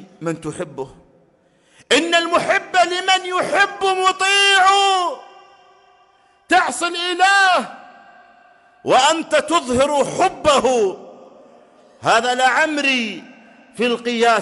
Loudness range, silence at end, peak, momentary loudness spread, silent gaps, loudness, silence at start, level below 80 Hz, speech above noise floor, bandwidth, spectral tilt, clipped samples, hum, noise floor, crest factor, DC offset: 4 LU; 0 s; -2 dBFS; 14 LU; none; -16 LUFS; 0 s; -56 dBFS; 40 dB; 11.5 kHz; -2 dB/octave; under 0.1%; none; -57 dBFS; 16 dB; under 0.1%